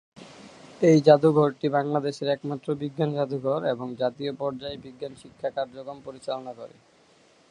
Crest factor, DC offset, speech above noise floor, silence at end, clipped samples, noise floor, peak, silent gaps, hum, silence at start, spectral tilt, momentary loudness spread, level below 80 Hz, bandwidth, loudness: 24 dB; under 0.1%; 34 dB; 0.85 s; under 0.1%; -59 dBFS; -2 dBFS; none; none; 0.15 s; -7 dB/octave; 21 LU; -68 dBFS; 10.5 kHz; -25 LUFS